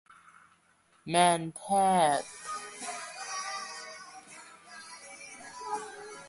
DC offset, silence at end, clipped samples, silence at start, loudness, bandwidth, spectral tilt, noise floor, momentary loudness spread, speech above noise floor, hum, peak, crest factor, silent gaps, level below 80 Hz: under 0.1%; 0 s; under 0.1%; 1.05 s; -30 LUFS; 11.5 kHz; -3.5 dB/octave; -66 dBFS; 23 LU; 40 dB; none; -10 dBFS; 24 dB; none; -74 dBFS